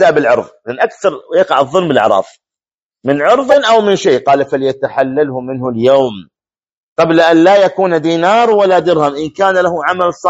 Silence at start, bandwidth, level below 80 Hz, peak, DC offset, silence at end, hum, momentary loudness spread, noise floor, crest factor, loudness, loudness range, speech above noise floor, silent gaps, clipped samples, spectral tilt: 0 s; 8 kHz; -56 dBFS; 0 dBFS; under 0.1%; 0 s; none; 8 LU; under -90 dBFS; 12 dB; -11 LUFS; 3 LU; over 79 dB; 2.82-2.89 s, 6.77-6.96 s; 0.2%; -5.5 dB/octave